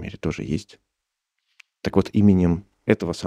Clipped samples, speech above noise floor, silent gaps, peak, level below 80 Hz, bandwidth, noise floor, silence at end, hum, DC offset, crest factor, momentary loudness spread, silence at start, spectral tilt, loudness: under 0.1%; 61 dB; none; -2 dBFS; -46 dBFS; 10.5 kHz; -82 dBFS; 0 s; none; under 0.1%; 20 dB; 12 LU; 0 s; -7.5 dB/octave; -22 LUFS